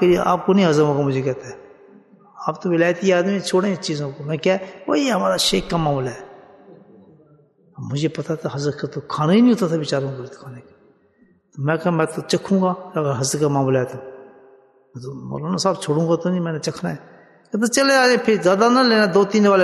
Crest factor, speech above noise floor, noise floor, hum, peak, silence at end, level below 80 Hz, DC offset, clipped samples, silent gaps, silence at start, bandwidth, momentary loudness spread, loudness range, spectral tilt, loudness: 16 dB; 38 dB; -57 dBFS; none; -2 dBFS; 0 s; -52 dBFS; under 0.1%; under 0.1%; none; 0 s; 12.5 kHz; 14 LU; 6 LU; -5 dB/octave; -19 LUFS